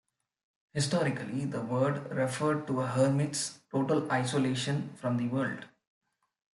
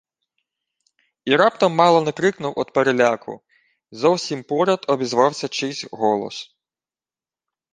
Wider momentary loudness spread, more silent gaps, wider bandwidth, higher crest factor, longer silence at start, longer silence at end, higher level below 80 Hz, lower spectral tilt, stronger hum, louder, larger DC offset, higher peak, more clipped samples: second, 7 LU vs 13 LU; neither; first, 12 kHz vs 9.8 kHz; about the same, 18 dB vs 20 dB; second, 0.75 s vs 1.25 s; second, 0.9 s vs 1.3 s; second, -72 dBFS vs -66 dBFS; about the same, -5.5 dB/octave vs -4.5 dB/octave; neither; second, -31 LUFS vs -19 LUFS; neither; second, -14 dBFS vs -2 dBFS; neither